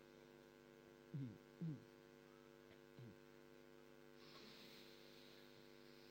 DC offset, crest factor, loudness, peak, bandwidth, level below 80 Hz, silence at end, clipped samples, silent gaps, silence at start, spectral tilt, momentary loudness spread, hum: under 0.1%; 18 dB; -60 LUFS; -42 dBFS; 16.5 kHz; -84 dBFS; 0 s; under 0.1%; none; 0 s; -6 dB/octave; 12 LU; none